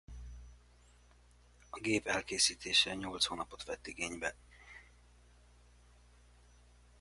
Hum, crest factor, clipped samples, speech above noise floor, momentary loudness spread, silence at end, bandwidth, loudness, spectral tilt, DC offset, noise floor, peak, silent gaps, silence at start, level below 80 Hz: 60 Hz at -60 dBFS; 24 dB; under 0.1%; 27 dB; 25 LU; 2.15 s; 11.5 kHz; -34 LUFS; -1.5 dB/octave; under 0.1%; -63 dBFS; -16 dBFS; none; 0.1 s; -58 dBFS